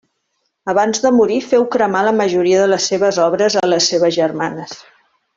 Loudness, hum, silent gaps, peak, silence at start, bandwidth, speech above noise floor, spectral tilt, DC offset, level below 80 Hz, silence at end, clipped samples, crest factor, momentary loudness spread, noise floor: -15 LUFS; none; none; -2 dBFS; 0.65 s; 7.8 kHz; 55 dB; -3.5 dB/octave; under 0.1%; -60 dBFS; 0.6 s; under 0.1%; 14 dB; 10 LU; -69 dBFS